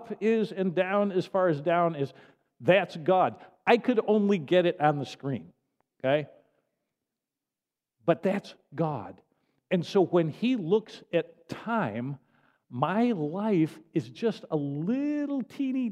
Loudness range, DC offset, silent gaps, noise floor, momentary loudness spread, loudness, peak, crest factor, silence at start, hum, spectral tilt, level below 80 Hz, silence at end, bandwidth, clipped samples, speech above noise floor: 7 LU; under 0.1%; none; under -90 dBFS; 11 LU; -28 LUFS; -6 dBFS; 22 dB; 0 s; none; -7.5 dB/octave; -78 dBFS; 0 s; 12 kHz; under 0.1%; over 63 dB